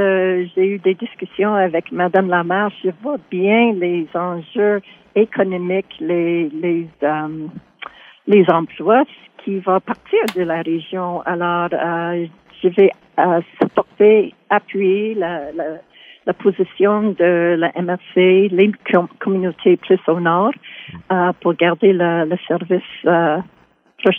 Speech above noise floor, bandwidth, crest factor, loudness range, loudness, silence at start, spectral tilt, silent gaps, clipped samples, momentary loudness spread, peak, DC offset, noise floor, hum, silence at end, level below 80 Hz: 21 dB; 5.2 kHz; 16 dB; 4 LU; -17 LUFS; 0 s; -8 dB/octave; none; under 0.1%; 11 LU; -2 dBFS; under 0.1%; -37 dBFS; none; 0 s; -64 dBFS